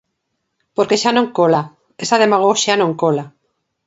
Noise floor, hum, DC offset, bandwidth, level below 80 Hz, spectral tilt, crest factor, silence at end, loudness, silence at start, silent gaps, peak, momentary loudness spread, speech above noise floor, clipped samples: -73 dBFS; none; under 0.1%; 8 kHz; -66 dBFS; -4 dB/octave; 16 dB; 0.6 s; -15 LUFS; 0.8 s; none; 0 dBFS; 11 LU; 58 dB; under 0.1%